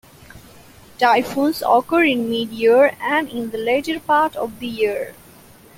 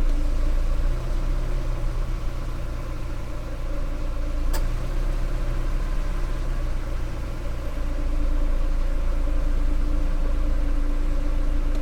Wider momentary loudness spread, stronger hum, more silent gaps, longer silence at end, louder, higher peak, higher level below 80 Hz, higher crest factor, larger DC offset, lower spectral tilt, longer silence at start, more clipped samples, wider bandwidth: first, 10 LU vs 5 LU; neither; neither; first, 0.65 s vs 0 s; first, -18 LUFS vs -30 LUFS; first, -2 dBFS vs -12 dBFS; second, -56 dBFS vs -22 dBFS; first, 16 dB vs 10 dB; neither; second, -4.5 dB/octave vs -6.5 dB/octave; first, 0.35 s vs 0 s; neither; first, 16.5 kHz vs 9 kHz